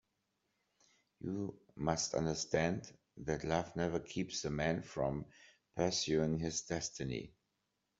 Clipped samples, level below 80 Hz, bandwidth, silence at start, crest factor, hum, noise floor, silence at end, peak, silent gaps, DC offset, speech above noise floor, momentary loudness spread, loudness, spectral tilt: under 0.1%; -62 dBFS; 7.8 kHz; 1.25 s; 22 dB; none; -85 dBFS; 0.7 s; -16 dBFS; none; under 0.1%; 47 dB; 11 LU; -38 LUFS; -4.5 dB/octave